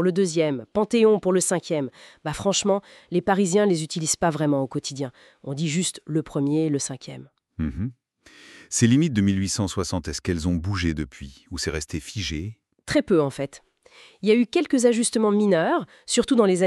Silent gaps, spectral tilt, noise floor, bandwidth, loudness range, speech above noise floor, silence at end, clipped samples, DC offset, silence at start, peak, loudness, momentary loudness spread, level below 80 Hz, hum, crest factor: none; -5 dB/octave; -51 dBFS; 13 kHz; 5 LU; 29 dB; 0 s; under 0.1%; under 0.1%; 0 s; -6 dBFS; -23 LUFS; 14 LU; -46 dBFS; none; 18 dB